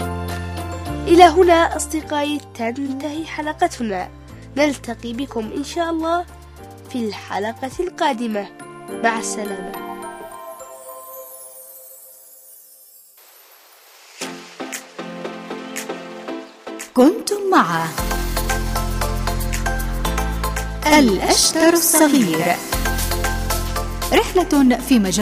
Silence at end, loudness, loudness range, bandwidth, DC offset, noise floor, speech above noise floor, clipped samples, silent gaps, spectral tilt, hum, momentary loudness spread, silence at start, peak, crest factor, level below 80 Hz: 0 s; -19 LUFS; 19 LU; 16 kHz; under 0.1%; -48 dBFS; 30 dB; under 0.1%; none; -4 dB/octave; none; 21 LU; 0 s; 0 dBFS; 20 dB; -32 dBFS